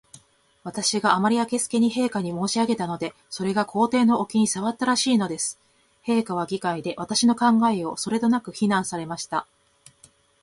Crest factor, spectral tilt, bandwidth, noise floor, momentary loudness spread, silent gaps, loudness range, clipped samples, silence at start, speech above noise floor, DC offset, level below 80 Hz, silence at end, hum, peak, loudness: 22 dB; -4 dB/octave; 11.5 kHz; -57 dBFS; 10 LU; none; 1 LU; under 0.1%; 0.65 s; 34 dB; under 0.1%; -64 dBFS; 1 s; none; -2 dBFS; -23 LUFS